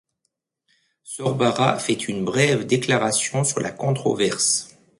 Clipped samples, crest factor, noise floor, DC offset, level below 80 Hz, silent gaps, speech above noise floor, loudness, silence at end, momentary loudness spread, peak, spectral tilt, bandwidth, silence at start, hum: under 0.1%; 20 dB; -76 dBFS; under 0.1%; -60 dBFS; none; 55 dB; -21 LUFS; 0.35 s; 5 LU; -2 dBFS; -4 dB/octave; 12 kHz; 1.05 s; none